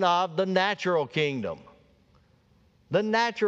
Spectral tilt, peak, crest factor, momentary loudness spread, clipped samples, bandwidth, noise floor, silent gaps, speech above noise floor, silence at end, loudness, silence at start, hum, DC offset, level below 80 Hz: -5 dB/octave; -10 dBFS; 18 dB; 10 LU; under 0.1%; 8 kHz; -62 dBFS; none; 37 dB; 0 s; -26 LUFS; 0 s; none; under 0.1%; -68 dBFS